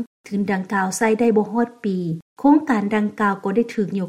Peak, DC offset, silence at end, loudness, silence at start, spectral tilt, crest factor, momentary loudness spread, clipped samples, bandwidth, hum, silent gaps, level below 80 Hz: -4 dBFS; under 0.1%; 0 s; -20 LUFS; 0 s; -6 dB/octave; 16 dB; 8 LU; under 0.1%; 14.5 kHz; none; 0.07-0.24 s, 2.22-2.36 s; -62 dBFS